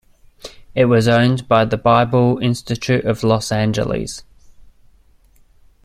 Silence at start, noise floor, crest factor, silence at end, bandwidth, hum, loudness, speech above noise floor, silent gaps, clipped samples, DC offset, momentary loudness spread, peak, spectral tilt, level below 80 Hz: 0.45 s; -51 dBFS; 16 dB; 1.65 s; 14 kHz; none; -16 LUFS; 36 dB; none; under 0.1%; under 0.1%; 16 LU; 0 dBFS; -6 dB/octave; -44 dBFS